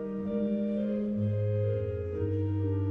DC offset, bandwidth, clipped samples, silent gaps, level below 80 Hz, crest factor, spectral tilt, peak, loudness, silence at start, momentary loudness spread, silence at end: under 0.1%; 3.8 kHz; under 0.1%; none; -58 dBFS; 10 dB; -11.5 dB/octave; -20 dBFS; -31 LUFS; 0 s; 3 LU; 0 s